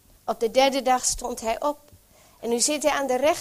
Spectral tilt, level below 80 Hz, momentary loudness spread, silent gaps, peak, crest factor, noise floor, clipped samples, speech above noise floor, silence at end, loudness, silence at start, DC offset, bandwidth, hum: -1.5 dB/octave; -50 dBFS; 10 LU; none; -6 dBFS; 18 dB; -54 dBFS; under 0.1%; 31 dB; 0 s; -23 LUFS; 0.25 s; under 0.1%; 16 kHz; none